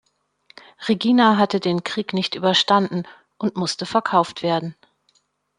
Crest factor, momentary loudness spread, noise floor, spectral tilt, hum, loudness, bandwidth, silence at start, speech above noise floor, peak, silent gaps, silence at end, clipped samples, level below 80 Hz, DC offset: 20 dB; 12 LU; -65 dBFS; -5 dB/octave; none; -20 LUFS; 11 kHz; 0.8 s; 45 dB; -2 dBFS; none; 0.85 s; under 0.1%; -66 dBFS; under 0.1%